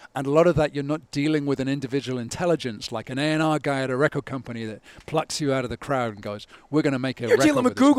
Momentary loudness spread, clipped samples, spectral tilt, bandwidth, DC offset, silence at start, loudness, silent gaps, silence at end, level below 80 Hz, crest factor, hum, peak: 13 LU; under 0.1%; -5.5 dB/octave; 14 kHz; under 0.1%; 0 s; -24 LUFS; none; 0 s; -52 dBFS; 18 dB; none; -4 dBFS